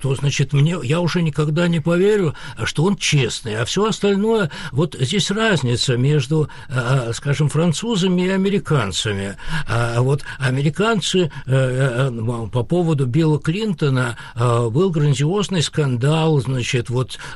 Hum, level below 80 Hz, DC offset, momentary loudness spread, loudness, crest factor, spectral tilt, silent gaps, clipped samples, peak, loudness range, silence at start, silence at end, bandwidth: none; -40 dBFS; under 0.1%; 6 LU; -19 LUFS; 12 dB; -5.5 dB/octave; none; under 0.1%; -6 dBFS; 1 LU; 0 s; 0 s; 12 kHz